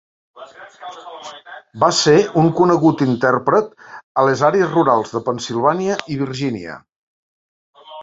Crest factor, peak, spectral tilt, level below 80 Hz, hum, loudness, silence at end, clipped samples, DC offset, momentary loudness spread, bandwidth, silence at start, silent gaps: 16 dB; -2 dBFS; -5.5 dB/octave; -58 dBFS; none; -16 LUFS; 0 s; under 0.1%; under 0.1%; 21 LU; 7.8 kHz; 0.35 s; 4.03-4.15 s, 6.96-7.73 s